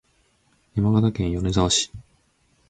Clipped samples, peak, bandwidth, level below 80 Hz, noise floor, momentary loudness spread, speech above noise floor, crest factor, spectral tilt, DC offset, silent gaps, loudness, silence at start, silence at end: under 0.1%; -6 dBFS; 9.4 kHz; -40 dBFS; -64 dBFS; 9 LU; 43 dB; 18 dB; -5 dB/octave; under 0.1%; none; -22 LUFS; 0.75 s; 0.7 s